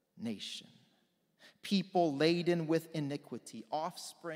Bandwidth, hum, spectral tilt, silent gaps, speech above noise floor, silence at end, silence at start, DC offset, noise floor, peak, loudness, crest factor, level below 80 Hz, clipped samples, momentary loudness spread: 16 kHz; none; -5.5 dB/octave; none; 40 dB; 0 s; 0.15 s; under 0.1%; -75 dBFS; -16 dBFS; -35 LUFS; 20 dB; -84 dBFS; under 0.1%; 16 LU